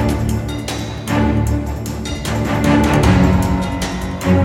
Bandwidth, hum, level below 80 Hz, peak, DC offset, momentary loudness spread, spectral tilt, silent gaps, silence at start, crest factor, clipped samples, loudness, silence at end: 17 kHz; none; -24 dBFS; -2 dBFS; under 0.1%; 11 LU; -6.5 dB/octave; none; 0 s; 14 dB; under 0.1%; -17 LUFS; 0 s